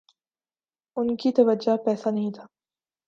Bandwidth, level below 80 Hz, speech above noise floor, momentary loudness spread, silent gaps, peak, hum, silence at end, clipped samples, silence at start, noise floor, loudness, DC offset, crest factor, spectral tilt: 7.4 kHz; -72 dBFS; over 67 dB; 13 LU; none; -6 dBFS; none; 0.6 s; under 0.1%; 0.95 s; under -90 dBFS; -24 LUFS; under 0.1%; 20 dB; -7.5 dB/octave